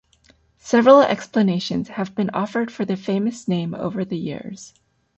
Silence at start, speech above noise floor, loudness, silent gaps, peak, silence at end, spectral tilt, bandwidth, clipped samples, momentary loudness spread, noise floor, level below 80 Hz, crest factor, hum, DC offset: 0.65 s; 38 dB; -20 LUFS; none; -2 dBFS; 0.5 s; -6.5 dB/octave; 8.2 kHz; under 0.1%; 15 LU; -57 dBFS; -60 dBFS; 18 dB; none; under 0.1%